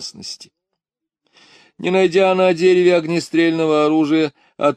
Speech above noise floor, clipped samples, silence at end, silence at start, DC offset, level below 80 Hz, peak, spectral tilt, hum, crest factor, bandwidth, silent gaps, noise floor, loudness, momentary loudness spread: 67 dB; under 0.1%; 0 s; 0 s; under 0.1%; -68 dBFS; -2 dBFS; -5.5 dB/octave; none; 14 dB; 10 kHz; none; -83 dBFS; -16 LUFS; 15 LU